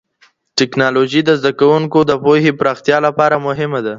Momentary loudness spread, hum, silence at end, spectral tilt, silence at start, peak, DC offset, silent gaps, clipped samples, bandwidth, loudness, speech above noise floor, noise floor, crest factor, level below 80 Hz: 5 LU; none; 0 s; -5.5 dB/octave; 0.55 s; 0 dBFS; under 0.1%; none; under 0.1%; 7.6 kHz; -13 LUFS; 41 dB; -54 dBFS; 14 dB; -54 dBFS